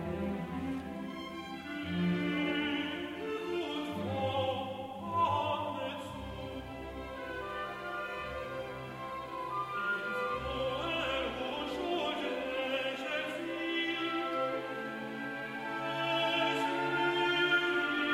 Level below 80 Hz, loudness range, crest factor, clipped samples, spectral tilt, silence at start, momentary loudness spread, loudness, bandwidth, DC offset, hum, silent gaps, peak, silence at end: -58 dBFS; 6 LU; 18 dB; under 0.1%; -5.5 dB/octave; 0 s; 11 LU; -35 LUFS; 16 kHz; under 0.1%; none; none; -16 dBFS; 0 s